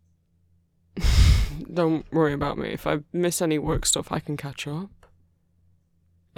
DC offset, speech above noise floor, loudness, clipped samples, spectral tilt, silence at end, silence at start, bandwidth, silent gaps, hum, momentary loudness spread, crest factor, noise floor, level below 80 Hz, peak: under 0.1%; 39 dB; -25 LUFS; under 0.1%; -5 dB/octave; 1.5 s; 0.95 s; 17 kHz; none; none; 12 LU; 20 dB; -64 dBFS; -30 dBFS; -6 dBFS